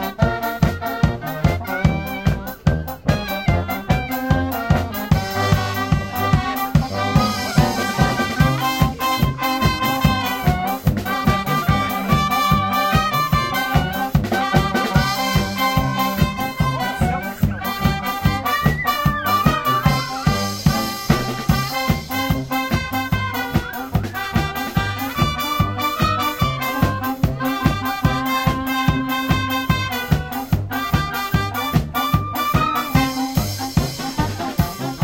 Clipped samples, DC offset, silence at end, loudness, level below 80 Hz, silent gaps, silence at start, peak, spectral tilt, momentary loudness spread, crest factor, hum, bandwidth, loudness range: under 0.1%; under 0.1%; 0 s; -20 LUFS; -32 dBFS; none; 0 s; 0 dBFS; -5.5 dB/octave; 4 LU; 18 dB; none; 17 kHz; 3 LU